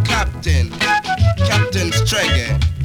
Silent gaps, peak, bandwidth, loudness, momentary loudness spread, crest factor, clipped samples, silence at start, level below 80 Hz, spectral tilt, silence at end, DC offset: none; -2 dBFS; 17.5 kHz; -16 LUFS; 3 LU; 14 dB; under 0.1%; 0 s; -24 dBFS; -4.5 dB/octave; 0 s; under 0.1%